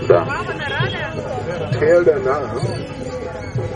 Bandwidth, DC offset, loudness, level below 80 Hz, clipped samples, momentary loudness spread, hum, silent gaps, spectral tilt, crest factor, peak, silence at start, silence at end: 10 kHz; under 0.1%; -19 LUFS; -42 dBFS; under 0.1%; 13 LU; none; none; -6.5 dB/octave; 18 dB; 0 dBFS; 0 s; 0 s